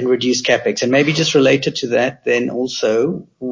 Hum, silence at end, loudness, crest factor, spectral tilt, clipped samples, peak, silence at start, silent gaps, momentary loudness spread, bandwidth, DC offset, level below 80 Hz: none; 0 s; -16 LUFS; 14 dB; -4 dB/octave; under 0.1%; -2 dBFS; 0 s; none; 6 LU; 7.6 kHz; under 0.1%; -58 dBFS